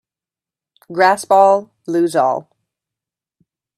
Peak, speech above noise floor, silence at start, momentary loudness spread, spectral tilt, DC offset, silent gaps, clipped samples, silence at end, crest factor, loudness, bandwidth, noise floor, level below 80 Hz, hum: 0 dBFS; 75 dB; 0.9 s; 11 LU; -4.5 dB/octave; under 0.1%; none; under 0.1%; 1.35 s; 18 dB; -15 LUFS; 13.5 kHz; -90 dBFS; -70 dBFS; none